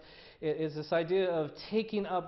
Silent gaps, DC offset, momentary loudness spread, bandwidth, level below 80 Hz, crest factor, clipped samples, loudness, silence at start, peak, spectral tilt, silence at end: none; under 0.1%; 6 LU; 6 kHz; -66 dBFS; 14 dB; under 0.1%; -33 LUFS; 0 s; -20 dBFS; -8 dB/octave; 0 s